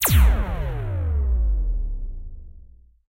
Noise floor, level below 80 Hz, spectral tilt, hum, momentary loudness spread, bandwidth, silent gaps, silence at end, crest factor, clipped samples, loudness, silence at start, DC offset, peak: -47 dBFS; -22 dBFS; -4.5 dB/octave; none; 19 LU; 16 kHz; none; 0.55 s; 14 dB; under 0.1%; -24 LUFS; 0 s; under 0.1%; -6 dBFS